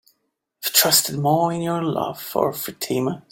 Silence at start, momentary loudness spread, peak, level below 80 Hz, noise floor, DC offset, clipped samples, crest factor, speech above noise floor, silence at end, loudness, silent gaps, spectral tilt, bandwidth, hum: 0.6 s; 11 LU; 0 dBFS; -62 dBFS; -73 dBFS; under 0.1%; under 0.1%; 22 dB; 51 dB; 0.1 s; -20 LUFS; none; -3 dB/octave; 17 kHz; none